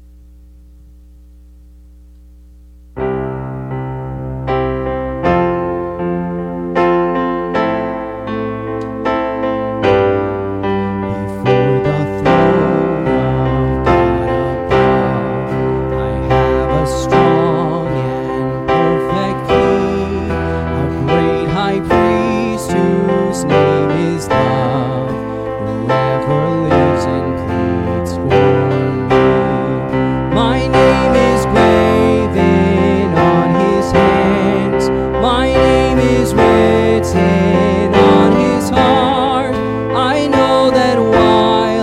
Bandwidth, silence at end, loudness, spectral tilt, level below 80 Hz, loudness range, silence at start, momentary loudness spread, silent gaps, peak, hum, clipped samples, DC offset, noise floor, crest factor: 14 kHz; 0 s; -14 LUFS; -7 dB/octave; -30 dBFS; 6 LU; 2.95 s; 9 LU; none; 0 dBFS; none; under 0.1%; under 0.1%; -40 dBFS; 12 dB